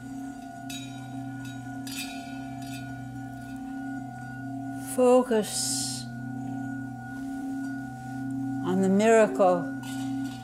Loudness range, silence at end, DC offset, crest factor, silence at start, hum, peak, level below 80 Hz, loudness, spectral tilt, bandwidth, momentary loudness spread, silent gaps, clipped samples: 11 LU; 0 s; under 0.1%; 18 dB; 0 s; none; -10 dBFS; -60 dBFS; -29 LUFS; -5 dB/octave; 16 kHz; 17 LU; none; under 0.1%